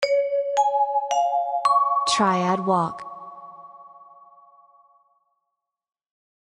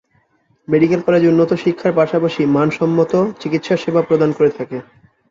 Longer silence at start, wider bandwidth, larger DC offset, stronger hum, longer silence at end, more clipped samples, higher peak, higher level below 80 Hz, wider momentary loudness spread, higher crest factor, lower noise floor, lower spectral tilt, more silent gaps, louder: second, 0 s vs 0.7 s; first, 10.5 kHz vs 7.6 kHz; neither; neither; first, 2.7 s vs 0.5 s; neither; second, -8 dBFS vs -2 dBFS; second, -70 dBFS vs -56 dBFS; first, 20 LU vs 5 LU; about the same, 16 dB vs 14 dB; first, -81 dBFS vs -59 dBFS; second, -4.5 dB/octave vs -8 dB/octave; neither; second, -22 LUFS vs -15 LUFS